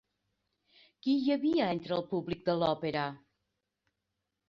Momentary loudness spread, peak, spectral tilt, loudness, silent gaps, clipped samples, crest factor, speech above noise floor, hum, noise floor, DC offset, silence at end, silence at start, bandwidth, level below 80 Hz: 7 LU; -14 dBFS; -8 dB/octave; -32 LUFS; none; under 0.1%; 20 dB; 55 dB; none; -85 dBFS; under 0.1%; 1.3 s; 1.05 s; 7 kHz; -68 dBFS